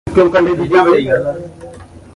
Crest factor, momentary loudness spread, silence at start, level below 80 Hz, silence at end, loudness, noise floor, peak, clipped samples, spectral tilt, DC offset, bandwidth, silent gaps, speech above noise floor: 14 dB; 15 LU; 0.05 s; -38 dBFS; 0.15 s; -12 LUFS; -34 dBFS; 0 dBFS; under 0.1%; -7 dB/octave; under 0.1%; 11 kHz; none; 23 dB